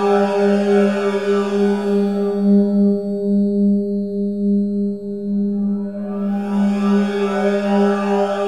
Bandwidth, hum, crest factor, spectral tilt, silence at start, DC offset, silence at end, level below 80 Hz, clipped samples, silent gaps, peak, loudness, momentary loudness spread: 9.2 kHz; none; 12 dB; -8 dB/octave; 0 s; 0.6%; 0 s; -56 dBFS; under 0.1%; none; -4 dBFS; -18 LUFS; 7 LU